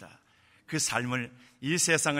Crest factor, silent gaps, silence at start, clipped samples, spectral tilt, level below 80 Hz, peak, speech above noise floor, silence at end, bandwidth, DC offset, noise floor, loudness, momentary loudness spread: 20 dB; none; 0 s; under 0.1%; -3 dB/octave; -70 dBFS; -10 dBFS; 34 dB; 0 s; 16 kHz; under 0.1%; -63 dBFS; -29 LUFS; 13 LU